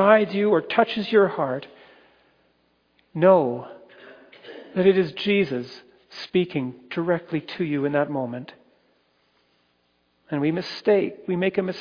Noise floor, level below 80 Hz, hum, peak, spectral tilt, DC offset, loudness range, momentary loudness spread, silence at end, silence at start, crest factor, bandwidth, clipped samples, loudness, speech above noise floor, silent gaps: -67 dBFS; -68 dBFS; none; -2 dBFS; -7.5 dB/octave; under 0.1%; 6 LU; 19 LU; 0 s; 0 s; 22 dB; 5.2 kHz; under 0.1%; -23 LUFS; 45 dB; none